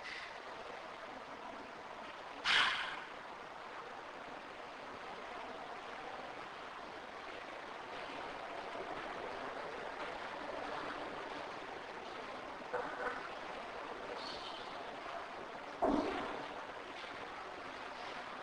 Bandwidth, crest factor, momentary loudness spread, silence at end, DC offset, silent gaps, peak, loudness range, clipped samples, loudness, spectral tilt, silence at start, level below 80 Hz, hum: 10.5 kHz; 24 dB; 10 LU; 0 s; under 0.1%; none; -20 dBFS; 9 LU; under 0.1%; -43 LUFS; -3 dB/octave; 0 s; -68 dBFS; none